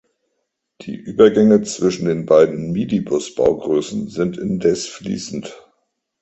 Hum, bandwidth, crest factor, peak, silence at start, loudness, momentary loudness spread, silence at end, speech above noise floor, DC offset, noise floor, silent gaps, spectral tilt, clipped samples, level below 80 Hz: none; 8.2 kHz; 18 dB; 0 dBFS; 0.8 s; -17 LUFS; 15 LU; 0.65 s; 57 dB; under 0.1%; -74 dBFS; none; -6 dB/octave; under 0.1%; -52 dBFS